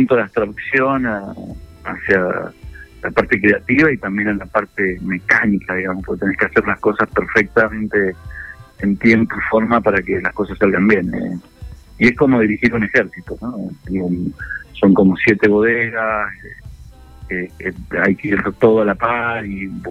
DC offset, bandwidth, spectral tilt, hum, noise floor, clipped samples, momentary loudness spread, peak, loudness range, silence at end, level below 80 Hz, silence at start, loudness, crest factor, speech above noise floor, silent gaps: under 0.1%; 9 kHz; -8 dB/octave; none; -39 dBFS; under 0.1%; 15 LU; 0 dBFS; 2 LU; 0 s; -40 dBFS; 0 s; -16 LUFS; 16 dB; 22 dB; none